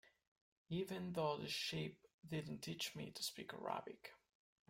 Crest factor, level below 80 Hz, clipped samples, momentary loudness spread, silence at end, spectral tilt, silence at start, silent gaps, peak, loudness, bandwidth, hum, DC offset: 18 dB; -76 dBFS; under 0.1%; 11 LU; 0.55 s; -4 dB/octave; 0.05 s; 0.27-0.66 s, 2.14-2.23 s; -30 dBFS; -46 LUFS; 16.5 kHz; none; under 0.1%